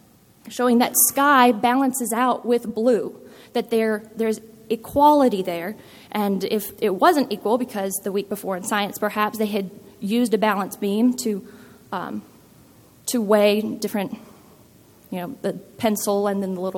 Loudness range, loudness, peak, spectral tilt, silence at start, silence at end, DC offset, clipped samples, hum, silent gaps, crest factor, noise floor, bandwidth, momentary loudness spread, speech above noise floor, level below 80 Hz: 6 LU; -21 LUFS; -2 dBFS; -4 dB/octave; 0.45 s; 0 s; under 0.1%; under 0.1%; none; none; 20 dB; -51 dBFS; 17.5 kHz; 16 LU; 30 dB; -62 dBFS